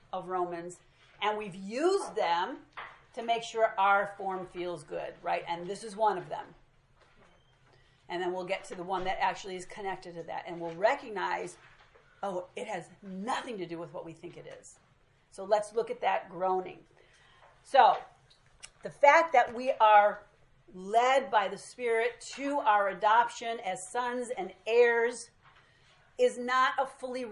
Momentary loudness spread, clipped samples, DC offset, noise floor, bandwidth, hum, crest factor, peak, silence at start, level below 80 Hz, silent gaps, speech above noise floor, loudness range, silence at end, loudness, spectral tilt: 19 LU; under 0.1%; under 0.1%; -66 dBFS; 11.5 kHz; none; 24 dB; -6 dBFS; 0.15 s; -68 dBFS; none; 36 dB; 11 LU; 0 s; -30 LUFS; -3.5 dB/octave